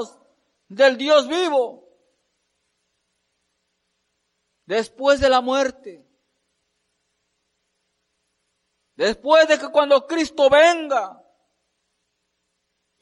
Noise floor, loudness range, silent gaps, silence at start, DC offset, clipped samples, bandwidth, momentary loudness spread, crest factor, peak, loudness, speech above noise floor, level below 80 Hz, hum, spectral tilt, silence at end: -75 dBFS; 12 LU; none; 0 s; under 0.1%; under 0.1%; 11.5 kHz; 11 LU; 18 dB; -4 dBFS; -18 LUFS; 57 dB; -54 dBFS; none; -3 dB/octave; 1.9 s